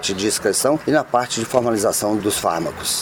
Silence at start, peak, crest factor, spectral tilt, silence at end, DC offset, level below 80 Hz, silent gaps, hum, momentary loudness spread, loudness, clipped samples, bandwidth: 0 s; -2 dBFS; 18 dB; -3 dB/octave; 0 s; under 0.1%; -50 dBFS; none; none; 3 LU; -19 LUFS; under 0.1%; 19.5 kHz